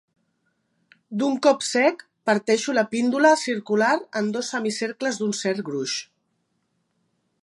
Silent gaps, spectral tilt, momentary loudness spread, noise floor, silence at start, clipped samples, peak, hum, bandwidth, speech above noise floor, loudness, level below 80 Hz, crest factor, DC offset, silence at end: none; -3.5 dB/octave; 9 LU; -72 dBFS; 1.1 s; under 0.1%; -4 dBFS; none; 11.5 kHz; 50 dB; -23 LUFS; -78 dBFS; 20 dB; under 0.1%; 1.4 s